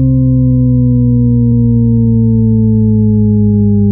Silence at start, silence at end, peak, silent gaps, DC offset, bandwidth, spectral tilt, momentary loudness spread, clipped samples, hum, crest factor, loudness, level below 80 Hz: 0 s; 0 s; 0 dBFS; none; under 0.1%; 1.1 kHz; -16.5 dB/octave; 0 LU; under 0.1%; none; 8 dB; -10 LUFS; -24 dBFS